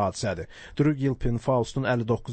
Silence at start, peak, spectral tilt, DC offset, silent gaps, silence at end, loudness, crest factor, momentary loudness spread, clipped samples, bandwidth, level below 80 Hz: 0 s; -10 dBFS; -6.5 dB/octave; under 0.1%; none; 0 s; -27 LUFS; 14 dB; 8 LU; under 0.1%; 8.8 kHz; -42 dBFS